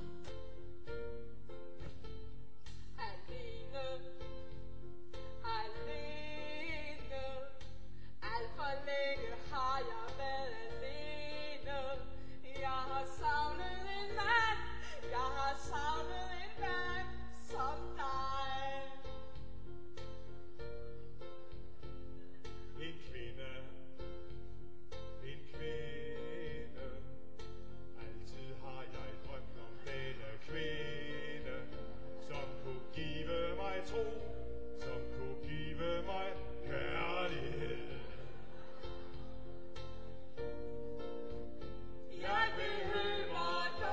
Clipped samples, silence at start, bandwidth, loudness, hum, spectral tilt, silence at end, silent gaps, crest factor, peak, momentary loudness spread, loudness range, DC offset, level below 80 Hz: under 0.1%; 0 s; 8 kHz; -43 LUFS; none; -5 dB/octave; 0 s; none; 22 dB; -20 dBFS; 15 LU; 13 LU; 1%; -54 dBFS